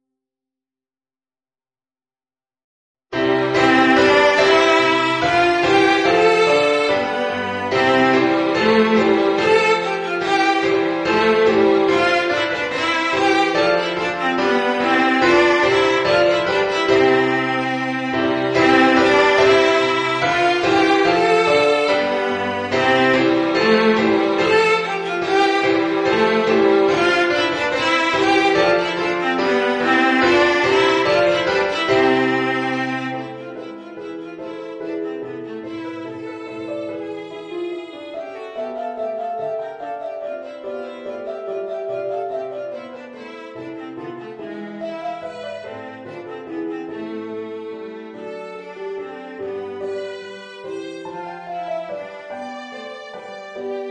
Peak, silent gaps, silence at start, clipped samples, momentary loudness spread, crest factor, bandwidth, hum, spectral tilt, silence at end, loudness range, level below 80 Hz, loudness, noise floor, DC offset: -2 dBFS; none; 3.1 s; under 0.1%; 18 LU; 18 dB; 10 kHz; none; -4.5 dB/octave; 0 s; 15 LU; -54 dBFS; -17 LUFS; under -90 dBFS; under 0.1%